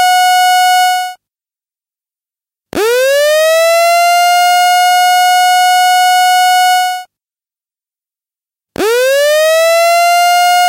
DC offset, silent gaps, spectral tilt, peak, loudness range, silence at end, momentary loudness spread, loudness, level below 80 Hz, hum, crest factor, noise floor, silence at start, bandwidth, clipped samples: under 0.1%; none; 0.5 dB/octave; -4 dBFS; 5 LU; 0 s; 7 LU; -9 LUFS; -60 dBFS; none; 8 dB; under -90 dBFS; 0 s; 16 kHz; under 0.1%